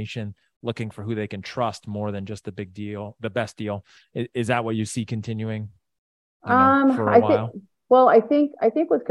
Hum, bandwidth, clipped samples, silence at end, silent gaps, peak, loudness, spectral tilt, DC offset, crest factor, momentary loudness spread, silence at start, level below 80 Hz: none; 12 kHz; under 0.1%; 0 s; 0.56-0.61 s, 5.98-6.40 s; -2 dBFS; -22 LUFS; -6.5 dB/octave; under 0.1%; 20 dB; 17 LU; 0 s; -64 dBFS